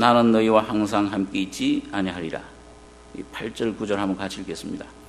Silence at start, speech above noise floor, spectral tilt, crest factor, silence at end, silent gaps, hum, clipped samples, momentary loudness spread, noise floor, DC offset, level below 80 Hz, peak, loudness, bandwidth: 0 s; 23 dB; -5.5 dB/octave; 22 dB; 0.05 s; none; none; under 0.1%; 17 LU; -46 dBFS; under 0.1%; -52 dBFS; -2 dBFS; -24 LUFS; 13 kHz